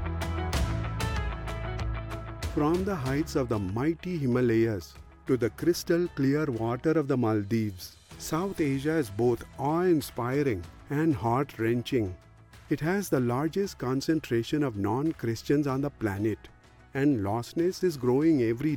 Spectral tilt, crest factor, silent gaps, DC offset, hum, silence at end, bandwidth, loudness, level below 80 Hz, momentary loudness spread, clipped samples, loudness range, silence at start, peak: -6.5 dB/octave; 14 dB; none; under 0.1%; none; 0 s; 17.5 kHz; -29 LUFS; -44 dBFS; 9 LU; under 0.1%; 2 LU; 0 s; -14 dBFS